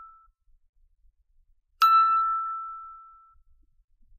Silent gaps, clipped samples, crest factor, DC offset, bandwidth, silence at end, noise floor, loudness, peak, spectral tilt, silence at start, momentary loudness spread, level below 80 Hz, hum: 0.69-0.73 s; under 0.1%; 18 dB; under 0.1%; 14.5 kHz; 1.2 s; -64 dBFS; -22 LUFS; -10 dBFS; 1 dB/octave; 0 s; 20 LU; -64 dBFS; none